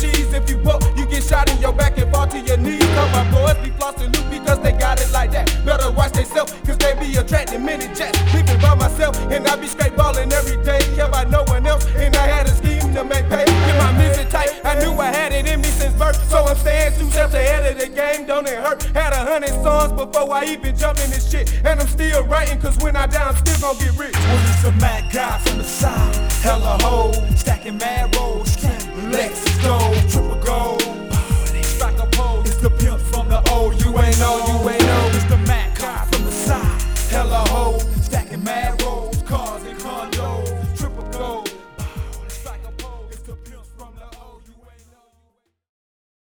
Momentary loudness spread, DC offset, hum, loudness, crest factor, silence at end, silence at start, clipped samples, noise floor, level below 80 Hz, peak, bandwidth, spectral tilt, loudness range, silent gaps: 8 LU; under 0.1%; none; -18 LUFS; 16 dB; 1.95 s; 0 s; under 0.1%; -65 dBFS; -20 dBFS; 0 dBFS; over 20 kHz; -5 dB/octave; 7 LU; none